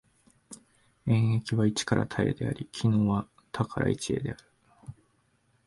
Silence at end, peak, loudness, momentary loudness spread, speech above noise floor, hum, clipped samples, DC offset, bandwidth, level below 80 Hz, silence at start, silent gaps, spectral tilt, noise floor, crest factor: 0.75 s; -12 dBFS; -29 LUFS; 23 LU; 42 dB; none; under 0.1%; under 0.1%; 11.5 kHz; -54 dBFS; 0.5 s; none; -6 dB/octave; -69 dBFS; 18 dB